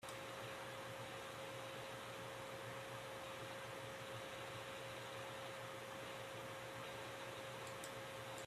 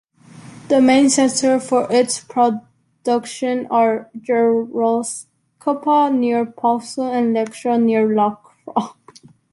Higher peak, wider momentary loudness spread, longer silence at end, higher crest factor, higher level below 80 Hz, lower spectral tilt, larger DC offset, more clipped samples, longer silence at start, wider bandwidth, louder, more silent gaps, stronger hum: second, -36 dBFS vs -2 dBFS; second, 1 LU vs 10 LU; second, 0 s vs 0.6 s; about the same, 14 dB vs 16 dB; second, -78 dBFS vs -64 dBFS; about the same, -3.5 dB/octave vs -4 dB/octave; neither; neither; second, 0 s vs 0.35 s; first, 15.5 kHz vs 11.5 kHz; second, -50 LUFS vs -18 LUFS; neither; neither